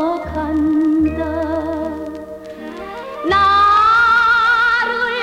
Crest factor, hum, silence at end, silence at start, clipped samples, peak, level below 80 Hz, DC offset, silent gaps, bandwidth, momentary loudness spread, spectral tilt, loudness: 12 dB; none; 0 s; 0 s; under 0.1%; -4 dBFS; -38 dBFS; under 0.1%; none; 10.5 kHz; 19 LU; -5.5 dB/octave; -14 LUFS